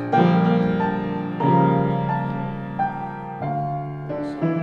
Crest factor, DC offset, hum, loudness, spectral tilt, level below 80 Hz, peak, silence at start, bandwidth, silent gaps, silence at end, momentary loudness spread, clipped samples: 18 dB; under 0.1%; none; -22 LUFS; -9.5 dB/octave; -50 dBFS; -4 dBFS; 0 s; 5.2 kHz; none; 0 s; 12 LU; under 0.1%